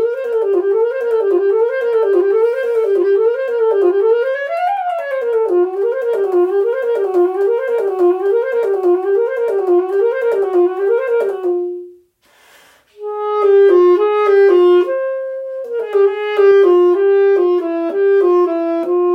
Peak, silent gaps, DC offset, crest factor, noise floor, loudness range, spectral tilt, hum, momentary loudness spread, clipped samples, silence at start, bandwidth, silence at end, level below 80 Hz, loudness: -2 dBFS; none; under 0.1%; 12 dB; -52 dBFS; 4 LU; -5 dB/octave; none; 8 LU; under 0.1%; 0 s; 5.4 kHz; 0 s; -74 dBFS; -14 LUFS